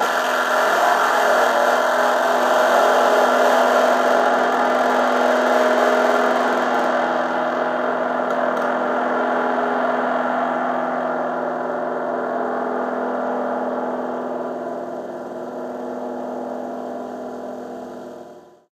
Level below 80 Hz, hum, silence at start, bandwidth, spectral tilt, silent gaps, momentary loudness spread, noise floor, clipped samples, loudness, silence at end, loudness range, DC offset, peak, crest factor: -70 dBFS; none; 0 s; 15.5 kHz; -3 dB/octave; none; 14 LU; -42 dBFS; under 0.1%; -19 LUFS; 0.3 s; 12 LU; under 0.1%; -4 dBFS; 16 dB